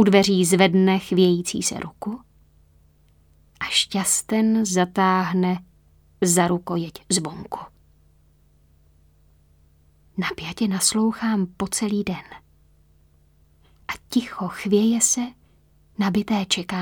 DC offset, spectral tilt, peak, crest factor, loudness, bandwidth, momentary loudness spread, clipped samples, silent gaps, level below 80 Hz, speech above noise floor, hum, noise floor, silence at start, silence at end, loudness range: under 0.1%; -4 dB/octave; -2 dBFS; 22 dB; -21 LUFS; 20 kHz; 16 LU; under 0.1%; none; -56 dBFS; 36 dB; none; -57 dBFS; 0 s; 0 s; 8 LU